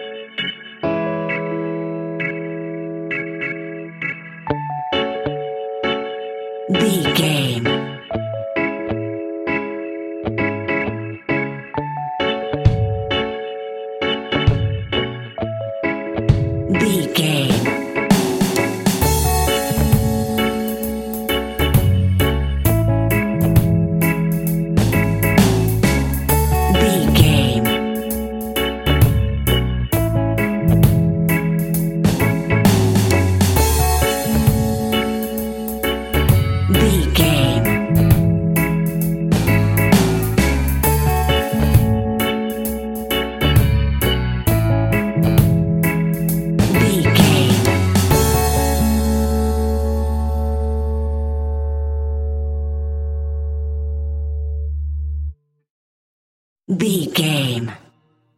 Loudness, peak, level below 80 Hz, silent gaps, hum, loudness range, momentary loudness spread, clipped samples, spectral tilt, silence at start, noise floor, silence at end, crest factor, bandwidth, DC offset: -18 LUFS; 0 dBFS; -26 dBFS; 55.70-56.56 s; none; 8 LU; 10 LU; under 0.1%; -5.5 dB/octave; 0 s; -58 dBFS; 0.6 s; 18 dB; 17 kHz; under 0.1%